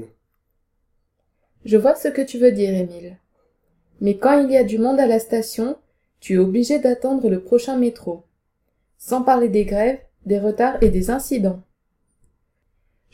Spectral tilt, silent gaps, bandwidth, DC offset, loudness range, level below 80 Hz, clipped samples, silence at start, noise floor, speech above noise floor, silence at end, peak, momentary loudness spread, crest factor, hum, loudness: -6.5 dB/octave; none; 16 kHz; under 0.1%; 3 LU; -38 dBFS; under 0.1%; 0 s; -70 dBFS; 52 dB; 1.55 s; -2 dBFS; 14 LU; 18 dB; none; -19 LUFS